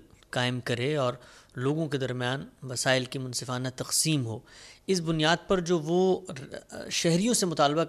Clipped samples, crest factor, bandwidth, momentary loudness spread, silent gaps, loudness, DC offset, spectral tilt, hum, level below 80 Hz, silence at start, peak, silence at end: under 0.1%; 20 dB; 15 kHz; 14 LU; none; -28 LUFS; under 0.1%; -4 dB/octave; none; -58 dBFS; 0.35 s; -8 dBFS; 0 s